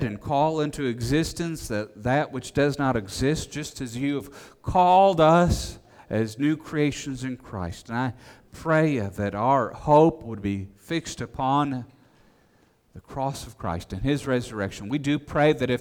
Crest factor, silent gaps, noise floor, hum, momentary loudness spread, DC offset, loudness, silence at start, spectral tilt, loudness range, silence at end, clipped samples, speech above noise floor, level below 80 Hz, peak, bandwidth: 18 dB; none; -62 dBFS; none; 15 LU; under 0.1%; -25 LUFS; 0 s; -6 dB/octave; 8 LU; 0 s; under 0.1%; 37 dB; -44 dBFS; -6 dBFS; 18 kHz